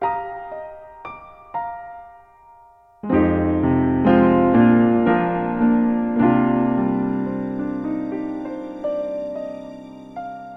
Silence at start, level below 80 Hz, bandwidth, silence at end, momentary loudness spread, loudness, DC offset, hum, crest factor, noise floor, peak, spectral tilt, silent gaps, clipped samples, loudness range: 0 s; -46 dBFS; 4.6 kHz; 0 s; 22 LU; -19 LUFS; under 0.1%; none; 18 dB; -50 dBFS; -4 dBFS; -10 dB/octave; none; under 0.1%; 10 LU